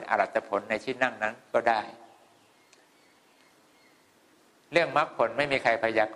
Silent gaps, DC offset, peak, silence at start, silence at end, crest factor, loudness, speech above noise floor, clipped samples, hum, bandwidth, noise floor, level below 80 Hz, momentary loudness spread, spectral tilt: none; under 0.1%; -8 dBFS; 0 s; 0 s; 22 dB; -27 LUFS; 35 dB; under 0.1%; none; 12 kHz; -62 dBFS; -68 dBFS; 6 LU; -4.5 dB/octave